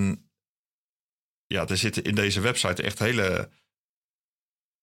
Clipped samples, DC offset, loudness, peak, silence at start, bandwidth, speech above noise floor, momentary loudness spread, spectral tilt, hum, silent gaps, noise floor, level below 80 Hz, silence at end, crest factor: under 0.1%; under 0.1%; -25 LUFS; -6 dBFS; 0 s; 16.5 kHz; over 64 dB; 8 LU; -4 dB/octave; none; 0.48-1.50 s; under -90 dBFS; -56 dBFS; 1.35 s; 22 dB